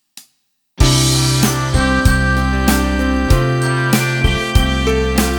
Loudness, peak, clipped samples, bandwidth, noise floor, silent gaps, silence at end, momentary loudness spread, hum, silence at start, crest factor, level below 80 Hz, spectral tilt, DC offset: -15 LUFS; 0 dBFS; under 0.1%; over 20 kHz; -64 dBFS; none; 0 s; 3 LU; none; 0.15 s; 14 dB; -20 dBFS; -4.5 dB/octave; under 0.1%